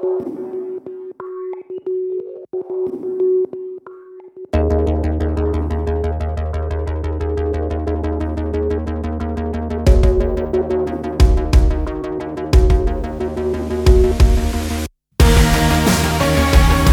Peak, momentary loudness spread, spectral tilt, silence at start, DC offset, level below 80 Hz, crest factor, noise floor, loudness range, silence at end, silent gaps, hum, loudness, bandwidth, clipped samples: -2 dBFS; 14 LU; -6 dB/octave; 0 s; under 0.1%; -20 dBFS; 16 dB; -38 dBFS; 7 LU; 0 s; none; none; -18 LUFS; 17.5 kHz; under 0.1%